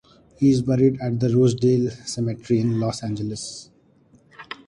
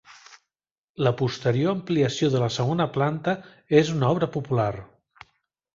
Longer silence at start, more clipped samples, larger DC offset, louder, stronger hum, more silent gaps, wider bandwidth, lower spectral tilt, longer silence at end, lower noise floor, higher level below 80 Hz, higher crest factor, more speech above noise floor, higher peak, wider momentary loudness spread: first, 0.4 s vs 0.1 s; neither; neither; about the same, -22 LUFS vs -24 LUFS; neither; second, none vs 0.72-0.94 s; first, 11 kHz vs 7.6 kHz; about the same, -7 dB/octave vs -6.5 dB/octave; second, 0.15 s vs 0.9 s; second, -56 dBFS vs under -90 dBFS; about the same, -54 dBFS vs -58 dBFS; second, 14 dB vs 20 dB; second, 35 dB vs over 67 dB; about the same, -8 dBFS vs -6 dBFS; first, 12 LU vs 7 LU